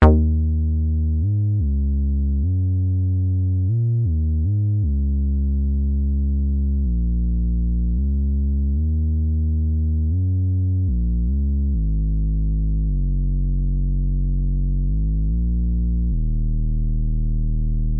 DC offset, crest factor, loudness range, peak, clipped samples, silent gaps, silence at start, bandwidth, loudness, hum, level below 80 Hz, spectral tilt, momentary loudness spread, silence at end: under 0.1%; 18 dB; 2 LU; 0 dBFS; under 0.1%; none; 0 s; 3.2 kHz; -22 LUFS; none; -22 dBFS; -12 dB/octave; 3 LU; 0 s